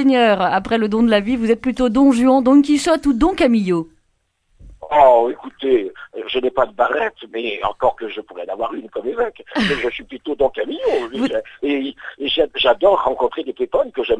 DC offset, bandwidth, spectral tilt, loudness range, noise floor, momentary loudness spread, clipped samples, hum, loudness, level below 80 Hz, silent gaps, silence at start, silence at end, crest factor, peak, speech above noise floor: under 0.1%; 11 kHz; -5 dB/octave; 7 LU; -66 dBFS; 12 LU; under 0.1%; none; -17 LUFS; -44 dBFS; none; 0 s; 0 s; 18 dB; 0 dBFS; 49 dB